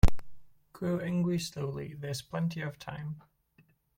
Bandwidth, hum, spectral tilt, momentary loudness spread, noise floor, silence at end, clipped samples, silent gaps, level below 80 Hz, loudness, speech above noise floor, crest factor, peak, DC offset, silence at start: 16 kHz; none; -6.5 dB/octave; 11 LU; -67 dBFS; 0.8 s; under 0.1%; none; -38 dBFS; -35 LUFS; 33 dB; 22 dB; -8 dBFS; under 0.1%; 0.05 s